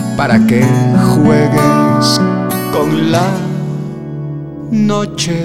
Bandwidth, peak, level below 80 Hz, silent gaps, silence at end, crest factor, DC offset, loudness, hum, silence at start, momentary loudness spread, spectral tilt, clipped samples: 16 kHz; 0 dBFS; -42 dBFS; none; 0 s; 12 dB; under 0.1%; -12 LUFS; none; 0 s; 13 LU; -6 dB/octave; under 0.1%